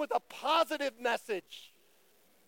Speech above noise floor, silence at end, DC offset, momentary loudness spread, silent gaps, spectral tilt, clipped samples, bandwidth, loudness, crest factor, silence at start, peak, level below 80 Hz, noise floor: 34 dB; 0.8 s; under 0.1%; 16 LU; none; -2 dB/octave; under 0.1%; 17 kHz; -33 LUFS; 18 dB; 0 s; -16 dBFS; -86 dBFS; -67 dBFS